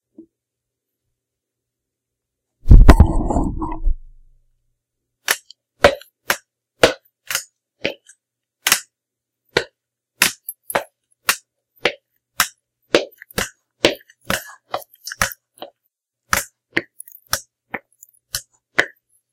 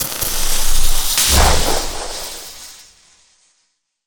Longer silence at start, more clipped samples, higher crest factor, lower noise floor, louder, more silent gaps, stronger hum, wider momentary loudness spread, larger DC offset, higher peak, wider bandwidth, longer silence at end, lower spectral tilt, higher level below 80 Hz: first, 2.65 s vs 0 s; first, 0.3% vs under 0.1%; first, 20 dB vs 14 dB; first, -83 dBFS vs -66 dBFS; second, -20 LUFS vs -16 LUFS; neither; neither; about the same, 17 LU vs 19 LU; neither; about the same, 0 dBFS vs 0 dBFS; second, 17 kHz vs over 20 kHz; second, 0.45 s vs 1.25 s; first, -4 dB/octave vs -2 dB/octave; about the same, -24 dBFS vs -20 dBFS